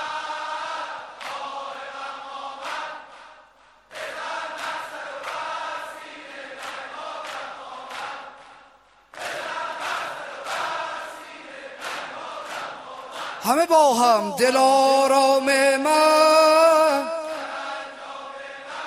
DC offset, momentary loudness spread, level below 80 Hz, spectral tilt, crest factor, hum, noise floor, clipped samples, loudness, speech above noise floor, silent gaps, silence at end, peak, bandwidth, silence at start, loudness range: under 0.1%; 20 LU; -70 dBFS; -2 dB/octave; 20 dB; none; -54 dBFS; under 0.1%; -22 LUFS; 37 dB; none; 0 s; -4 dBFS; 15.5 kHz; 0 s; 17 LU